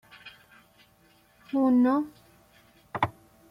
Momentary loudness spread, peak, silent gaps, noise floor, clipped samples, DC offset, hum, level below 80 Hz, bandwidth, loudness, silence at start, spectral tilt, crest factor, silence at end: 26 LU; -10 dBFS; none; -61 dBFS; under 0.1%; under 0.1%; none; -64 dBFS; 5.8 kHz; -26 LUFS; 0.25 s; -7.5 dB/octave; 20 dB; 0.4 s